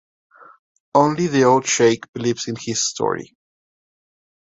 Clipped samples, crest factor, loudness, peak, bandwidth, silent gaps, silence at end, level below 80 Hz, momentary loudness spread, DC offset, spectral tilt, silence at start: under 0.1%; 20 dB; -19 LUFS; -2 dBFS; 8 kHz; 2.08-2.13 s; 1.2 s; -62 dBFS; 9 LU; under 0.1%; -4 dB/octave; 0.95 s